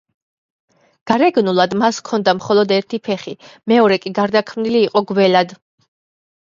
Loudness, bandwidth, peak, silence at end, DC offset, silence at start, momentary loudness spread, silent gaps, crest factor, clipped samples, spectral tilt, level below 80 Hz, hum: -16 LUFS; 7.6 kHz; 0 dBFS; 0.95 s; under 0.1%; 1.05 s; 9 LU; none; 16 dB; under 0.1%; -5.5 dB/octave; -62 dBFS; none